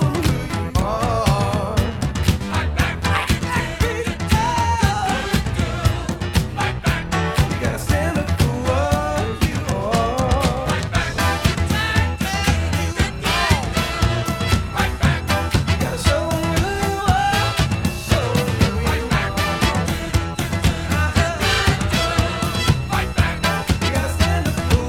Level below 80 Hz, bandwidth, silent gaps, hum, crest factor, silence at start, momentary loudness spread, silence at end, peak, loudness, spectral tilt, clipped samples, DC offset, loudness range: -28 dBFS; 17 kHz; none; none; 18 dB; 0 s; 4 LU; 0 s; -2 dBFS; -20 LUFS; -5 dB/octave; under 0.1%; under 0.1%; 1 LU